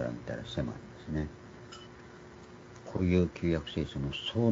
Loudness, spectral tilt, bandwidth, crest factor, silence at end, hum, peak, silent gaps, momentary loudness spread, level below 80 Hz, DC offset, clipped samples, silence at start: -34 LUFS; -7 dB/octave; 7.8 kHz; 20 dB; 0 s; none; -14 dBFS; none; 22 LU; -50 dBFS; under 0.1%; under 0.1%; 0 s